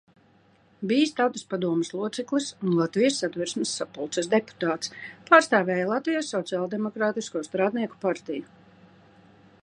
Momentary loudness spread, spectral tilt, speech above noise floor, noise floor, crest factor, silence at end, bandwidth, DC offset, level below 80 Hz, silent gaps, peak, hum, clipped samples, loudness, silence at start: 9 LU; -4.5 dB/octave; 34 dB; -60 dBFS; 24 dB; 1.2 s; 11 kHz; under 0.1%; -74 dBFS; none; -2 dBFS; none; under 0.1%; -26 LUFS; 0.8 s